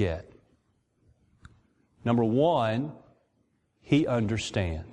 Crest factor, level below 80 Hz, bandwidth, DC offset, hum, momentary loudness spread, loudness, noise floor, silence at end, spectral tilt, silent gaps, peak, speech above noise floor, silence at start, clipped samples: 20 dB; -54 dBFS; 10.5 kHz; under 0.1%; none; 11 LU; -27 LUFS; -72 dBFS; 0 s; -6.5 dB/octave; none; -10 dBFS; 45 dB; 0 s; under 0.1%